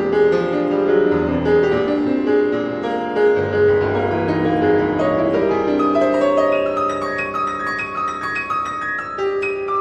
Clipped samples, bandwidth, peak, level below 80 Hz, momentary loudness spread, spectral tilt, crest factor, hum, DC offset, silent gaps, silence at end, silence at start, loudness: under 0.1%; 8.4 kHz; -6 dBFS; -46 dBFS; 6 LU; -7 dB/octave; 12 dB; none; under 0.1%; none; 0 s; 0 s; -18 LUFS